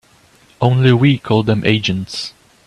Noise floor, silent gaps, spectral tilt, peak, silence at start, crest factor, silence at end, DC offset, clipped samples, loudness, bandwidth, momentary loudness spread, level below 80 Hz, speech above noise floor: -50 dBFS; none; -6.5 dB/octave; 0 dBFS; 0.6 s; 16 dB; 0.35 s; under 0.1%; under 0.1%; -15 LUFS; 10.5 kHz; 13 LU; -48 dBFS; 36 dB